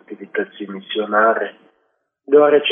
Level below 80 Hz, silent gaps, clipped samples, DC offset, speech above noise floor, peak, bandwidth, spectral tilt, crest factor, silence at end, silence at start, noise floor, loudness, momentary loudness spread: -82 dBFS; none; under 0.1%; under 0.1%; 51 dB; -2 dBFS; 3.7 kHz; -8.5 dB/octave; 16 dB; 0 s; 0.1 s; -68 dBFS; -17 LUFS; 16 LU